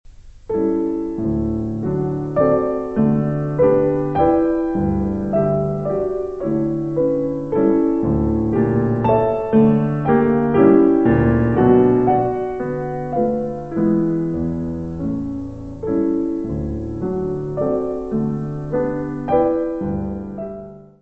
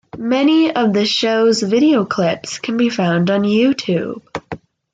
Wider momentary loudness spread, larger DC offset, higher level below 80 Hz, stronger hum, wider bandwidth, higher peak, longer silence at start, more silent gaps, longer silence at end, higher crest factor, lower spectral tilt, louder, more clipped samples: second, 10 LU vs 14 LU; first, 0.5% vs under 0.1%; first, -38 dBFS vs -58 dBFS; neither; second, 4.1 kHz vs 9.2 kHz; about the same, -2 dBFS vs -4 dBFS; about the same, 0.05 s vs 0.15 s; neither; second, 0.15 s vs 0.35 s; about the same, 16 dB vs 12 dB; first, -11 dB/octave vs -5.5 dB/octave; second, -19 LUFS vs -16 LUFS; neither